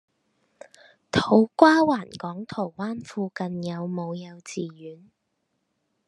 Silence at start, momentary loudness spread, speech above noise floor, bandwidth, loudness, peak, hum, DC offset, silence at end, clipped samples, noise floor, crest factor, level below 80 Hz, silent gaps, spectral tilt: 1.15 s; 19 LU; 52 dB; 11 kHz; -24 LUFS; -2 dBFS; none; under 0.1%; 1.1 s; under 0.1%; -76 dBFS; 24 dB; -64 dBFS; none; -6 dB/octave